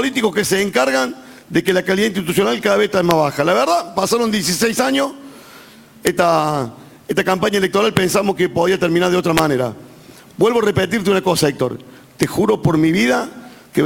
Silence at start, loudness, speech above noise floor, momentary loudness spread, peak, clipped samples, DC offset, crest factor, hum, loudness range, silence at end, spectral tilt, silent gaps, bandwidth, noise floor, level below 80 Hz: 0 s; -16 LUFS; 26 dB; 7 LU; 0 dBFS; under 0.1%; under 0.1%; 16 dB; none; 2 LU; 0 s; -4.5 dB/octave; none; 17 kHz; -42 dBFS; -48 dBFS